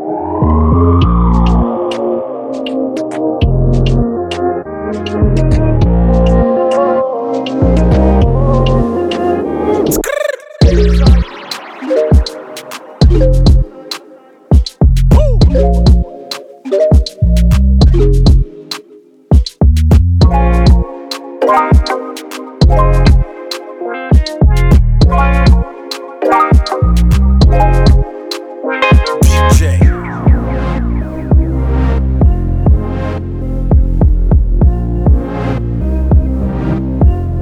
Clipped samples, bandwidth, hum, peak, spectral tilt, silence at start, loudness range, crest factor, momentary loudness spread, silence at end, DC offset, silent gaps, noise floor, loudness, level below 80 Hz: under 0.1%; 14 kHz; none; 0 dBFS; -7 dB/octave; 0 s; 3 LU; 10 dB; 12 LU; 0 s; under 0.1%; none; -41 dBFS; -12 LUFS; -12 dBFS